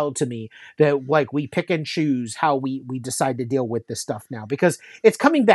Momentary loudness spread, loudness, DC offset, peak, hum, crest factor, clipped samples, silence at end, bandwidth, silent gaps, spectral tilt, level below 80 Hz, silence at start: 12 LU; -22 LUFS; under 0.1%; 0 dBFS; none; 20 dB; under 0.1%; 0 s; 12.5 kHz; none; -5.5 dB/octave; -70 dBFS; 0 s